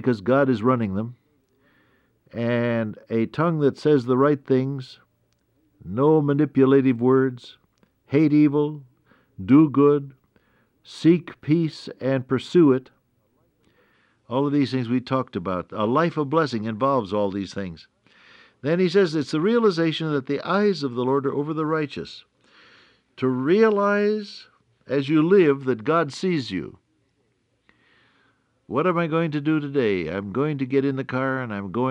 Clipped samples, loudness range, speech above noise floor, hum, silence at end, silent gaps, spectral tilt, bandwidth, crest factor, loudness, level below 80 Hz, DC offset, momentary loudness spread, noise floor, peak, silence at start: under 0.1%; 5 LU; 47 dB; none; 0 s; none; -8 dB/octave; 9.2 kHz; 18 dB; -22 LUFS; -64 dBFS; under 0.1%; 12 LU; -69 dBFS; -4 dBFS; 0 s